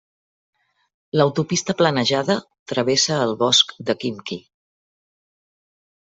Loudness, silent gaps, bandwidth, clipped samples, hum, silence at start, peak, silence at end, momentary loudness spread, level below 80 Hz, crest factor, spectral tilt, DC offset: -19 LUFS; 2.59-2.66 s; 8.2 kHz; under 0.1%; none; 1.15 s; -2 dBFS; 1.75 s; 11 LU; -62 dBFS; 20 dB; -3.5 dB/octave; under 0.1%